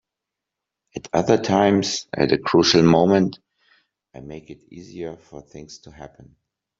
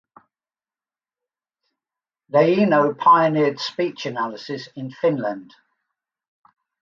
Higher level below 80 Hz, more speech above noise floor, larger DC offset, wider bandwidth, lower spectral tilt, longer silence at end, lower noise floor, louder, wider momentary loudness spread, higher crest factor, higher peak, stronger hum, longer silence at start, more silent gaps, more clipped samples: first, -54 dBFS vs -72 dBFS; second, 64 dB vs over 71 dB; neither; about the same, 7.8 kHz vs 7.4 kHz; second, -5 dB/octave vs -6.5 dB/octave; second, 0.75 s vs 1.4 s; second, -85 dBFS vs under -90 dBFS; about the same, -18 LUFS vs -19 LUFS; first, 25 LU vs 16 LU; about the same, 20 dB vs 20 dB; about the same, -2 dBFS vs -4 dBFS; neither; second, 0.95 s vs 2.35 s; neither; neither